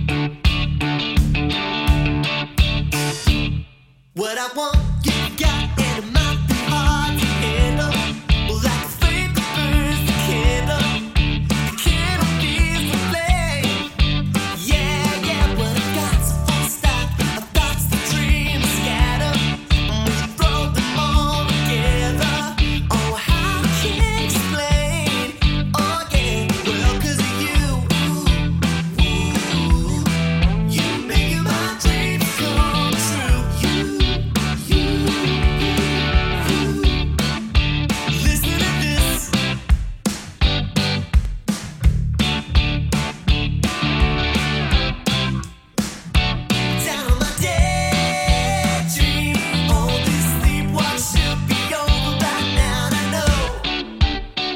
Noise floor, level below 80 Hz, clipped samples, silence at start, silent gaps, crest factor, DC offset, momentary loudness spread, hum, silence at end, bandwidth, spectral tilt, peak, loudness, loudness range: -49 dBFS; -22 dBFS; under 0.1%; 0 s; none; 18 dB; under 0.1%; 3 LU; none; 0 s; 17 kHz; -4.5 dB/octave; -2 dBFS; -19 LUFS; 2 LU